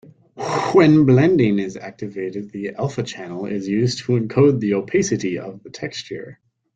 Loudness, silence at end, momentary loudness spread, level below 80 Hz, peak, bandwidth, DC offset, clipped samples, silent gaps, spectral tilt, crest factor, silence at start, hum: -19 LUFS; 0.4 s; 17 LU; -56 dBFS; -2 dBFS; 9 kHz; under 0.1%; under 0.1%; none; -6.5 dB/octave; 18 dB; 0.35 s; none